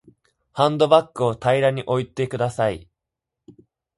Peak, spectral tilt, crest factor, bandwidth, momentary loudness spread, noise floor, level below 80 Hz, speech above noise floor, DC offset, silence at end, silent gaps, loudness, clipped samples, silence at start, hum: 0 dBFS; -6 dB/octave; 22 dB; 11.5 kHz; 9 LU; -84 dBFS; -56 dBFS; 64 dB; under 0.1%; 1.15 s; none; -21 LUFS; under 0.1%; 0.55 s; none